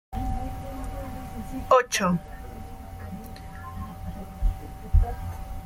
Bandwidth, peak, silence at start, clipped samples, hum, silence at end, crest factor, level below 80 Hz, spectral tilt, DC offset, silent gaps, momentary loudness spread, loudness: 16.5 kHz; -8 dBFS; 0.1 s; under 0.1%; none; 0 s; 20 dB; -32 dBFS; -5 dB/octave; under 0.1%; none; 19 LU; -29 LUFS